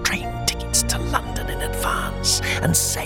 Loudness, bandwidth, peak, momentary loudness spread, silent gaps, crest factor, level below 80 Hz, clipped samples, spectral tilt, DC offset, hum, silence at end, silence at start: -21 LUFS; 18 kHz; -2 dBFS; 7 LU; none; 20 dB; -30 dBFS; under 0.1%; -2.5 dB/octave; under 0.1%; none; 0 s; 0 s